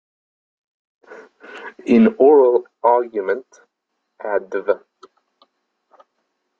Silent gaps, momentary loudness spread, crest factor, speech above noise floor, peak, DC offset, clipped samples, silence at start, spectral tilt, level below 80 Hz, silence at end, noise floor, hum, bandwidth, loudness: none; 21 LU; 18 dB; 60 dB; -2 dBFS; under 0.1%; under 0.1%; 1.1 s; -8 dB/octave; -68 dBFS; 1.85 s; -76 dBFS; none; 7.2 kHz; -17 LUFS